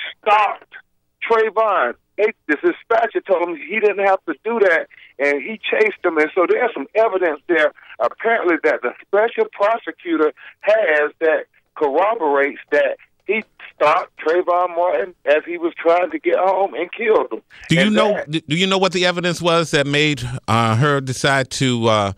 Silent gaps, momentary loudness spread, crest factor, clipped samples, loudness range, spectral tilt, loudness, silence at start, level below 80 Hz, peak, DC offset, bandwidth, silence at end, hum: none; 7 LU; 16 dB; under 0.1%; 2 LU; -5 dB/octave; -18 LUFS; 0 s; -56 dBFS; -2 dBFS; under 0.1%; 13.5 kHz; 0.05 s; none